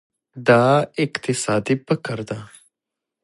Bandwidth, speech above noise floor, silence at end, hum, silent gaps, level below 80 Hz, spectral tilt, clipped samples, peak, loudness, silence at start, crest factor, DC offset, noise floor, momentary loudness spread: 11.5 kHz; 65 dB; 0.8 s; none; none; -60 dBFS; -5.5 dB/octave; under 0.1%; -2 dBFS; -20 LUFS; 0.35 s; 20 dB; under 0.1%; -85 dBFS; 14 LU